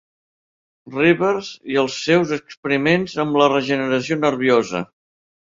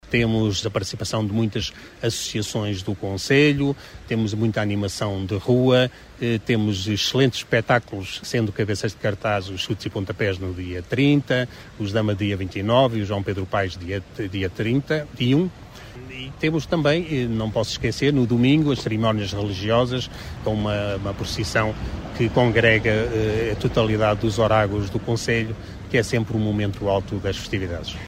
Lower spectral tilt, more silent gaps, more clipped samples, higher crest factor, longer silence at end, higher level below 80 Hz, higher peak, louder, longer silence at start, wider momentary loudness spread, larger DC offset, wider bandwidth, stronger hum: about the same, -5.5 dB/octave vs -5.5 dB/octave; first, 2.57-2.63 s vs none; neither; about the same, 18 dB vs 18 dB; first, 0.75 s vs 0 s; second, -58 dBFS vs -42 dBFS; about the same, -2 dBFS vs -4 dBFS; first, -19 LUFS vs -22 LUFS; first, 0.85 s vs 0.05 s; about the same, 10 LU vs 10 LU; neither; second, 7.6 kHz vs 16 kHz; neither